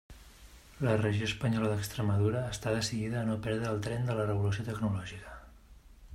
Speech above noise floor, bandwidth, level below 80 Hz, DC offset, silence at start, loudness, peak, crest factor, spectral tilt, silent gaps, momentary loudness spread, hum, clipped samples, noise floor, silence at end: 24 dB; 14.5 kHz; -54 dBFS; under 0.1%; 0.1 s; -32 LUFS; -16 dBFS; 18 dB; -6 dB/octave; none; 6 LU; none; under 0.1%; -55 dBFS; 0 s